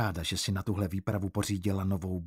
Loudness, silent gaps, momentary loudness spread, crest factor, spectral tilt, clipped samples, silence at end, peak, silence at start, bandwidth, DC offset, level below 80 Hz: -32 LUFS; none; 2 LU; 14 dB; -5 dB/octave; under 0.1%; 0 s; -18 dBFS; 0 s; 16 kHz; under 0.1%; -52 dBFS